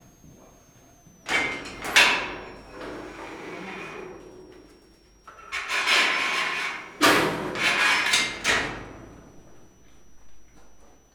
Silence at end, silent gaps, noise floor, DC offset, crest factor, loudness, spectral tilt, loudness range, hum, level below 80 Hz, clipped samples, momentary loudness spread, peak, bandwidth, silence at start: 0.25 s; none; -55 dBFS; under 0.1%; 24 dB; -22 LUFS; -1.5 dB/octave; 11 LU; none; -54 dBFS; under 0.1%; 21 LU; -2 dBFS; over 20 kHz; 0.25 s